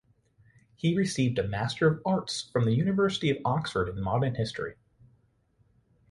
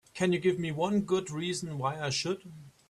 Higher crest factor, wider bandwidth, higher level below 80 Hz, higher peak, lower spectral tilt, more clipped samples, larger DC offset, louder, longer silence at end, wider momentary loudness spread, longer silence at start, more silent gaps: about the same, 18 dB vs 16 dB; about the same, 11.5 kHz vs 12.5 kHz; first, -54 dBFS vs -66 dBFS; about the same, -12 dBFS vs -14 dBFS; about the same, -6 dB/octave vs -5 dB/octave; neither; neither; first, -28 LUFS vs -31 LUFS; first, 1.4 s vs 0.2 s; about the same, 6 LU vs 7 LU; first, 0.85 s vs 0.15 s; neither